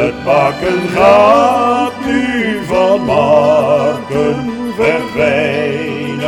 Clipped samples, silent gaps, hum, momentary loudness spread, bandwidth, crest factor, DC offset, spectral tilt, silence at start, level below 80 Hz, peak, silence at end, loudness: under 0.1%; none; none; 8 LU; 13.5 kHz; 12 dB; under 0.1%; -6 dB/octave; 0 s; -42 dBFS; 0 dBFS; 0 s; -12 LUFS